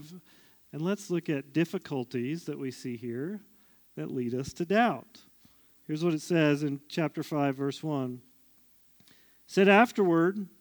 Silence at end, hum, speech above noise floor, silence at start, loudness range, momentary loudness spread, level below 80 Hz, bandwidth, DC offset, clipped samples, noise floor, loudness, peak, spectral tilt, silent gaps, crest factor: 0.15 s; none; 33 dB; 0 s; 6 LU; 14 LU; -72 dBFS; over 20 kHz; under 0.1%; under 0.1%; -62 dBFS; -29 LUFS; -8 dBFS; -6.5 dB/octave; none; 22 dB